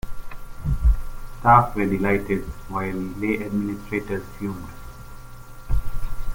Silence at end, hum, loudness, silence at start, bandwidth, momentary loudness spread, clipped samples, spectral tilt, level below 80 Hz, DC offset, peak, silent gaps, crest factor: 0 s; none; -24 LUFS; 0.05 s; 17 kHz; 26 LU; under 0.1%; -8 dB/octave; -28 dBFS; under 0.1%; -2 dBFS; none; 22 dB